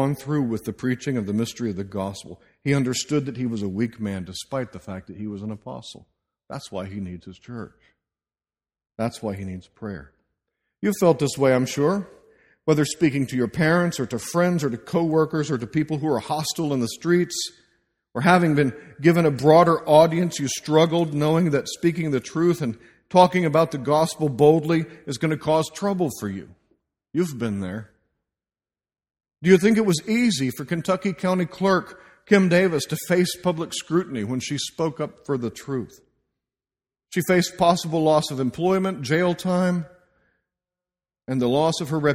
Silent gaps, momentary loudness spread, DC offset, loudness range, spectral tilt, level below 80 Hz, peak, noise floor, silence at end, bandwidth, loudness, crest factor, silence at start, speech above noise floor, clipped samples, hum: none; 16 LU; under 0.1%; 14 LU; -5.5 dB/octave; -58 dBFS; -2 dBFS; under -90 dBFS; 0 s; 16 kHz; -22 LUFS; 22 dB; 0 s; over 68 dB; under 0.1%; none